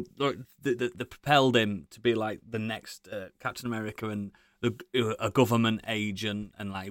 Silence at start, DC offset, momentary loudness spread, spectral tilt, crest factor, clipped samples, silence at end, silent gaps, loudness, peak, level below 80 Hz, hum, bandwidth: 0 s; under 0.1%; 13 LU; -5.5 dB/octave; 22 dB; under 0.1%; 0 s; none; -29 LUFS; -8 dBFS; -64 dBFS; none; 17 kHz